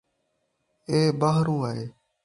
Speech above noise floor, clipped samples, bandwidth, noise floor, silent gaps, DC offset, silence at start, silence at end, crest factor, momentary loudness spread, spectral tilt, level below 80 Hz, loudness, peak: 51 dB; under 0.1%; 11.5 kHz; -75 dBFS; none; under 0.1%; 0.9 s; 0.35 s; 18 dB; 17 LU; -7 dB/octave; -62 dBFS; -24 LUFS; -8 dBFS